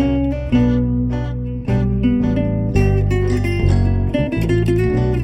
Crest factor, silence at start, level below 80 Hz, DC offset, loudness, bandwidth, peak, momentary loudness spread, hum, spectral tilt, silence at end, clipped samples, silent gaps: 12 dB; 0 s; -24 dBFS; under 0.1%; -18 LUFS; 13.5 kHz; -4 dBFS; 4 LU; none; -8.5 dB/octave; 0 s; under 0.1%; none